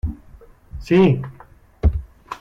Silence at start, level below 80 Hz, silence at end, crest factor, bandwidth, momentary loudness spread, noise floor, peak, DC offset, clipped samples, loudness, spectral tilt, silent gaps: 0.05 s; -28 dBFS; 0.05 s; 16 dB; 7.6 kHz; 24 LU; -45 dBFS; -6 dBFS; under 0.1%; under 0.1%; -19 LUFS; -8.5 dB/octave; none